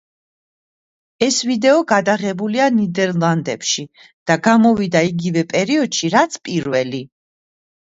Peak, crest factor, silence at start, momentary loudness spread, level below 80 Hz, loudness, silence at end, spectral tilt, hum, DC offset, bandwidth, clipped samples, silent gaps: 0 dBFS; 18 dB; 1.2 s; 7 LU; -60 dBFS; -17 LUFS; 0.85 s; -4.5 dB/octave; none; under 0.1%; 8 kHz; under 0.1%; 4.13-4.26 s